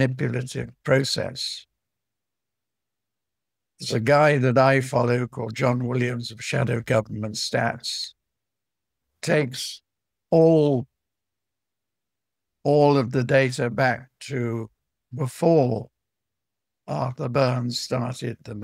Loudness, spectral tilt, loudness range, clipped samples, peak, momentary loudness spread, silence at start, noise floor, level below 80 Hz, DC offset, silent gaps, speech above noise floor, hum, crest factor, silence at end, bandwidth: -23 LUFS; -6 dB/octave; 6 LU; under 0.1%; -4 dBFS; 14 LU; 0 s; -87 dBFS; -62 dBFS; under 0.1%; none; 65 dB; none; 22 dB; 0 s; 15 kHz